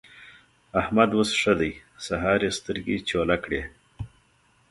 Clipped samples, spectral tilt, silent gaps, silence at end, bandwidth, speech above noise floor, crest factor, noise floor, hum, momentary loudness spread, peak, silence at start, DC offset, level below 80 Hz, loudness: under 0.1%; -4.5 dB/octave; none; 0.65 s; 11.5 kHz; 38 dB; 22 dB; -63 dBFS; none; 20 LU; -4 dBFS; 0.15 s; under 0.1%; -48 dBFS; -25 LUFS